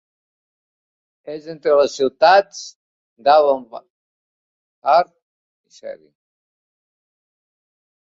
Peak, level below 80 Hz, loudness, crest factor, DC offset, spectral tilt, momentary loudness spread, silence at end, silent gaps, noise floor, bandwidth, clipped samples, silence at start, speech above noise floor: -2 dBFS; -70 dBFS; -16 LUFS; 20 dB; under 0.1%; -3 dB/octave; 23 LU; 2.25 s; 2.76-3.16 s, 3.90-4.82 s, 5.22-5.64 s; under -90 dBFS; 7.8 kHz; under 0.1%; 1.25 s; over 73 dB